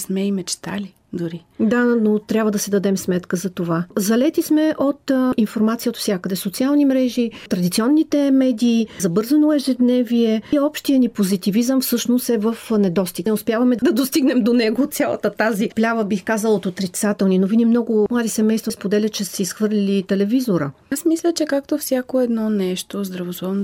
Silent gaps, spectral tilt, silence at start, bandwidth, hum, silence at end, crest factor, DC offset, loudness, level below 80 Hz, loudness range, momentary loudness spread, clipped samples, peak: none; -5.5 dB/octave; 0 s; 16.5 kHz; none; 0 s; 12 dB; under 0.1%; -19 LUFS; -58 dBFS; 3 LU; 7 LU; under 0.1%; -6 dBFS